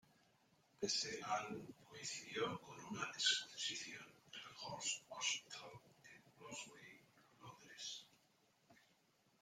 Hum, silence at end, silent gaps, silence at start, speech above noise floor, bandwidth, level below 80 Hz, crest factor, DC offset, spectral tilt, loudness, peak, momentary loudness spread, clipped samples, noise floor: none; 0.65 s; none; 0.8 s; 32 dB; 16 kHz; -86 dBFS; 26 dB; under 0.1%; -1 dB/octave; -44 LUFS; -22 dBFS; 21 LU; under 0.1%; -77 dBFS